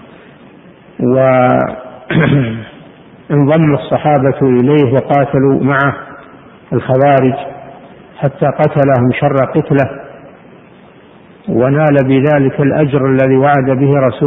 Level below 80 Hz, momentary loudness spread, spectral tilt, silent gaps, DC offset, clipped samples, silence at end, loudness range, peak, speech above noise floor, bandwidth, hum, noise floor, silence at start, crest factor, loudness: -44 dBFS; 10 LU; -11 dB/octave; none; under 0.1%; under 0.1%; 0 s; 3 LU; 0 dBFS; 29 dB; 3.9 kHz; none; -40 dBFS; 1 s; 12 dB; -11 LUFS